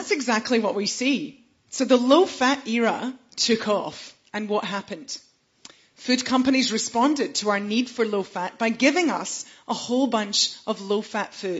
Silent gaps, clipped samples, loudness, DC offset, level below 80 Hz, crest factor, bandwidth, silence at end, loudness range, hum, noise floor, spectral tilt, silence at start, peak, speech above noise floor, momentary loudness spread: none; under 0.1%; -23 LUFS; under 0.1%; -68 dBFS; 20 dB; 8 kHz; 0 s; 4 LU; none; -51 dBFS; -3 dB/octave; 0 s; -4 dBFS; 28 dB; 13 LU